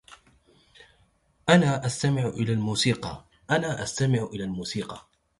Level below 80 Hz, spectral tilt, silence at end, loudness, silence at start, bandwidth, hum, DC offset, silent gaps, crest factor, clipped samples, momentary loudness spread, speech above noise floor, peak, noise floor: -56 dBFS; -5 dB/octave; 0.4 s; -26 LUFS; 0.1 s; 11.5 kHz; none; under 0.1%; none; 22 dB; under 0.1%; 14 LU; 40 dB; -4 dBFS; -65 dBFS